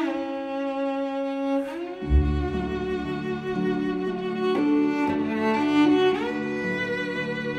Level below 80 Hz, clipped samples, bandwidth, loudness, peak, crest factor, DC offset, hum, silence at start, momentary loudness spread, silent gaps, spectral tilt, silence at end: -34 dBFS; under 0.1%; 8.8 kHz; -25 LUFS; -10 dBFS; 16 dB; under 0.1%; none; 0 s; 8 LU; none; -7.5 dB/octave; 0 s